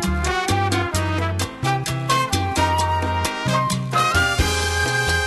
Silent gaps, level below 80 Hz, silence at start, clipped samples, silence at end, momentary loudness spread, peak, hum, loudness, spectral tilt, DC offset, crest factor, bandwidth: none; -32 dBFS; 0 s; under 0.1%; 0 s; 4 LU; -6 dBFS; none; -20 LUFS; -4 dB/octave; under 0.1%; 14 dB; 13 kHz